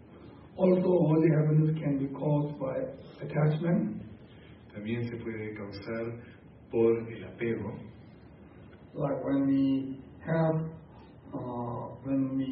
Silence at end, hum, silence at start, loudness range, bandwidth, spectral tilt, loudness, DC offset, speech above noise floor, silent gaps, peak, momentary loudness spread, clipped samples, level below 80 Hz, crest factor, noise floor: 0 s; none; 0 s; 6 LU; 5.6 kHz; -12.5 dB/octave; -30 LUFS; under 0.1%; 23 dB; none; -12 dBFS; 19 LU; under 0.1%; -60 dBFS; 18 dB; -52 dBFS